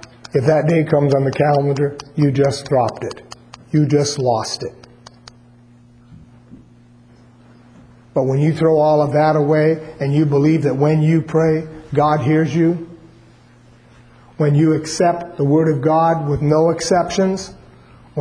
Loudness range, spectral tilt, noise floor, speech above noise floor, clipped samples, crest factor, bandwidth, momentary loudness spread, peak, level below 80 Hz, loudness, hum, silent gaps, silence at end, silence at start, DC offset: 6 LU; -7 dB/octave; -47 dBFS; 32 dB; under 0.1%; 16 dB; 10.5 kHz; 8 LU; -2 dBFS; -50 dBFS; -16 LUFS; none; none; 0 s; 0.35 s; under 0.1%